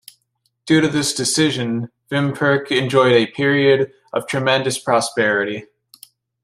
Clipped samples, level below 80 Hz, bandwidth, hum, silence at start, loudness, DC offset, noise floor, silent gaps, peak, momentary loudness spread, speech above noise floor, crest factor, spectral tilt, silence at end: under 0.1%; -60 dBFS; 15.5 kHz; none; 0.65 s; -17 LUFS; under 0.1%; -69 dBFS; none; -2 dBFS; 9 LU; 51 dB; 16 dB; -4.5 dB/octave; 0.8 s